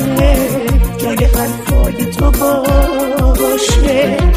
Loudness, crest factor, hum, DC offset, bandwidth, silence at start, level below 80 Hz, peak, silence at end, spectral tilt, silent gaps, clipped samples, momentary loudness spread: -13 LUFS; 10 dB; none; under 0.1%; 15.5 kHz; 0 s; -14 dBFS; 0 dBFS; 0 s; -5.5 dB/octave; none; under 0.1%; 3 LU